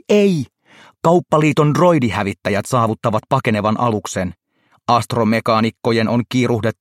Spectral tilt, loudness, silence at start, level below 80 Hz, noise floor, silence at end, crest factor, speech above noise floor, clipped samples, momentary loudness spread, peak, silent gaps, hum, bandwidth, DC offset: -6.5 dB/octave; -17 LUFS; 0.1 s; -54 dBFS; -48 dBFS; 0.1 s; 16 dB; 32 dB; under 0.1%; 7 LU; -2 dBFS; none; none; 16 kHz; under 0.1%